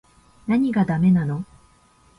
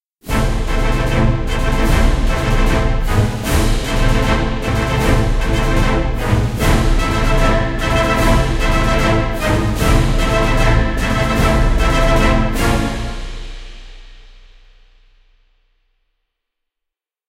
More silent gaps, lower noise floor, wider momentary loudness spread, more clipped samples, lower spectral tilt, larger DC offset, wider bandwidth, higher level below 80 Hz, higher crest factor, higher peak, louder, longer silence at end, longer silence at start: neither; second, -56 dBFS vs -82 dBFS; first, 16 LU vs 5 LU; neither; first, -9.5 dB/octave vs -5.5 dB/octave; neither; second, 10.5 kHz vs 16 kHz; second, -52 dBFS vs -18 dBFS; about the same, 14 dB vs 14 dB; second, -8 dBFS vs 0 dBFS; second, -21 LUFS vs -16 LUFS; second, 0.75 s vs 3.1 s; first, 0.45 s vs 0.25 s